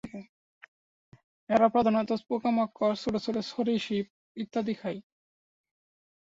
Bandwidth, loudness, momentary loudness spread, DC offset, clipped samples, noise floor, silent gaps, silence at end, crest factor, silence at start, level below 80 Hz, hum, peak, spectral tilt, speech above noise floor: 7.8 kHz; -29 LUFS; 17 LU; under 0.1%; under 0.1%; under -90 dBFS; 0.29-0.61 s, 0.68-1.12 s, 1.24-1.47 s, 4.10-4.35 s; 1.3 s; 20 dB; 0.05 s; -66 dBFS; none; -10 dBFS; -6.5 dB/octave; over 62 dB